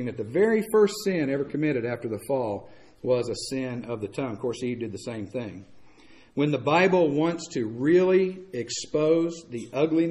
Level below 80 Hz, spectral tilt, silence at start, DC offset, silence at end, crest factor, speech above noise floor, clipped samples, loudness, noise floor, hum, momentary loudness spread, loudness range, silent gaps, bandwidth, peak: -62 dBFS; -6 dB/octave; 0 s; under 0.1%; 0 s; 16 dB; 27 dB; under 0.1%; -26 LUFS; -52 dBFS; none; 12 LU; 7 LU; none; 13 kHz; -8 dBFS